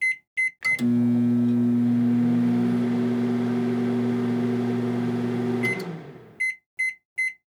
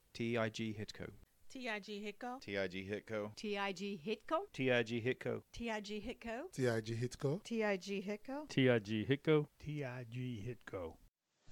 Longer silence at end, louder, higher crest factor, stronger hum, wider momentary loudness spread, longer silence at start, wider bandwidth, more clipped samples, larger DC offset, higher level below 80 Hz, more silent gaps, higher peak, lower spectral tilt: first, 0.2 s vs 0 s; first, -24 LUFS vs -40 LUFS; second, 10 dB vs 20 dB; neither; second, 6 LU vs 12 LU; second, 0 s vs 0.15 s; second, 11 kHz vs 17.5 kHz; neither; neither; about the same, -70 dBFS vs -68 dBFS; first, 0.27-0.36 s, 6.66-6.77 s, 7.05-7.16 s vs 11.08-11.12 s; first, -14 dBFS vs -20 dBFS; about the same, -7 dB/octave vs -6 dB/octave